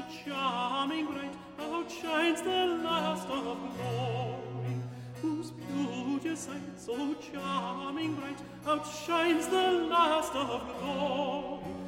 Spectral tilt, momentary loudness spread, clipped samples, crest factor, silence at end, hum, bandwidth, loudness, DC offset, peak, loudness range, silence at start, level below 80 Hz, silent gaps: -5 dB/octave; 11 LU; under 0.1%; 18 dB; 0 s; none; 16.5 kHz; -33 LUFS; under 0.1%; -14 dBFS; 6 LU; 0 s; -64 dBFS; none